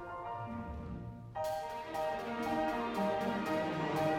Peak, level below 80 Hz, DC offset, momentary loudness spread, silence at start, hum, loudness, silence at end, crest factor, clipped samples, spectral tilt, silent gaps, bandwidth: -22 dBFS; -56 dBFS; under 0.1%; 10 LU; 0 s; none; -37 LUFS; 0 s; 16 dB; under 0.1%; -6 dB/octave; none; 18 kHz